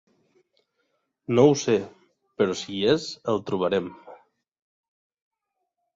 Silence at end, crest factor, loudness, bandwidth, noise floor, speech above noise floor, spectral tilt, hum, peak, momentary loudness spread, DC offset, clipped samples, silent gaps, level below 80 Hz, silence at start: 1.8 s; 24 dB; -24 LUFS; 7.8 kHz; -81 dBFS; 58 dB; -5.5 dB/octave; none; -4 dBFS; 12 LU; under 0.1%; under 0.1%; none; -64 dBFS; 1.3 s